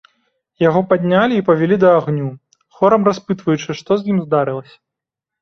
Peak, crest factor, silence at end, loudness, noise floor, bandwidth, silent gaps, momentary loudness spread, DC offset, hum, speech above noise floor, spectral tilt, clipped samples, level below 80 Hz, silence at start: -2 dBFS; 14 dB; 0.8 s; -16 LUFS; -84 dBFS; 6.8 kHz; none; 9 LU; under 0.1%; none; 69 dB; -7.5 dB/octave; under 0.1%; -56 dBFS; 0.6 s